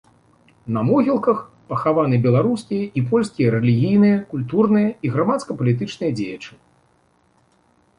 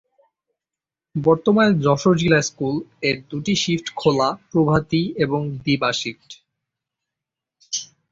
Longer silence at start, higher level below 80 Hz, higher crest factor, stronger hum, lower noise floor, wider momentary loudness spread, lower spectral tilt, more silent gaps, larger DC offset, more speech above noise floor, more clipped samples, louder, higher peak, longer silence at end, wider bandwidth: second, 0.65 s vs 1.15 s; about the same, -56 dBFS vs -52 dBFS; about the same, 16 dB vs 18 dB; neither; second, -60 dBFS vs -88 dBFS; about the same, 10 LU vs 12 LU; first, -8.5 dB/octave vs -5 dB/octave; neither; neither; second, 42 dB vs 69 dB; neither; about the same, -19 LUFS vs -20 LUFS; about the same, -4 dBFS vs -2 dBFS; first, 1.5 s vs 0.25 s; first, 10.5 kHz vs 7.8 kHz